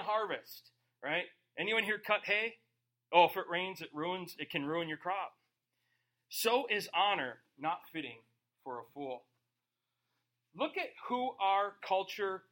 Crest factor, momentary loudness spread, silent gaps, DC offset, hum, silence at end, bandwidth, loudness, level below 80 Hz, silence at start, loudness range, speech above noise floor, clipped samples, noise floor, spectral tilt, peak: 26 dB; 15 LU; none; under 0.1%; none; 0.15 s; 16.5 kHz; -35 LUFS; -88 dBFS; 0 s; 10 LU; 53 dB; under 0.1%; -88 dBFS; -3 dB/octave; -12 dBFS